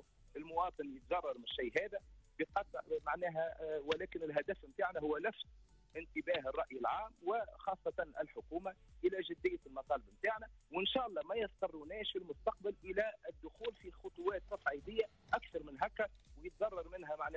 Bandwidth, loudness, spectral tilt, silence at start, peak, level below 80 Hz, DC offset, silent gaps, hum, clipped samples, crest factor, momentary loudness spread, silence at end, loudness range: 8 kHz; -41 LUFS; -5.5 dB/octave; 0.35 s; -24 dBFS; -64 dBFS; under 0.1%; none; none; under 0.1%; 18 dB; 9 LU; 0 s; 2 LU